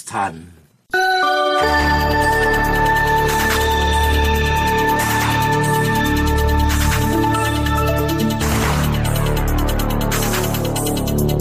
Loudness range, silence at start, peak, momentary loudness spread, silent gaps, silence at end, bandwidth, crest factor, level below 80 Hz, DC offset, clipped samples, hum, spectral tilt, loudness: 3 LU; 0 s; -4 dBFS; 4 LU; none; 0 s; 15.5 kHz; 12 dB; -24 dBFS; under 0.1%; under 0.1%; none; -4.5 dB/octave; -17 LUFS